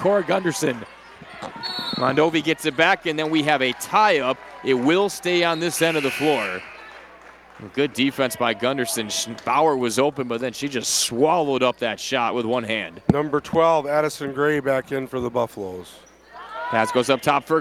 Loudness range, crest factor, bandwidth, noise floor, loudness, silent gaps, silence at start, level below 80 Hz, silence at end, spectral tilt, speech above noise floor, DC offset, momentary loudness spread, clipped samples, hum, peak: 4 LU; 18 dB; 16.5 kHz; -46 dBFS; -21 LUFS; none; 0 s; -56 dBFS; 0 s; -3.5 dB/octave; 25 dB; under 0.1%; 13 LU; under 0.1%; none; -4 dBFS